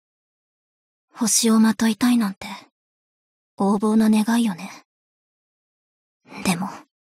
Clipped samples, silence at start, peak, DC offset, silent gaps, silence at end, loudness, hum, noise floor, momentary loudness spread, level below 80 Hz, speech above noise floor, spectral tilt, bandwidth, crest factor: under 0.1%; 1.15 s; -6 dBFS; under 0.1%; 2.72-3.57 s, 4.85-6.20 s; 0.25 s; -20 LUFS; none; under -90 dBFS; 18 LU; -64 dBFS; over 70 dB; -4 dB/octave; 16 kHz; 18 dB